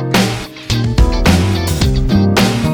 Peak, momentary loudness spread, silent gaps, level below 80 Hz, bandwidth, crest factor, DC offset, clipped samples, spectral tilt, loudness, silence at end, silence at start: 0 dBFS; 6 LU; none; -18 dBFS; over 20 kHz; 12 dB; under 0.1%; under 0.1%; -5.5 dB/octave; -14 LUFS; 0 s; 0 s